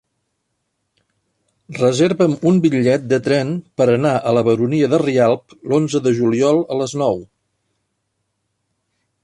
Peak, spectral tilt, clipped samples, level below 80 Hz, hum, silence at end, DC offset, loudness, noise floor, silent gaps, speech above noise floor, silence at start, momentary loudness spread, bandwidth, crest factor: -2 dBFS; -6.5 dB/octave; under 0.1%; -58 dBFS; none; 2 s; under 0.1%; -16 LUFS; -72 dBFS; none; 56 dB; 1.7 s; 6 LU; 11.5 kHz; 16 dB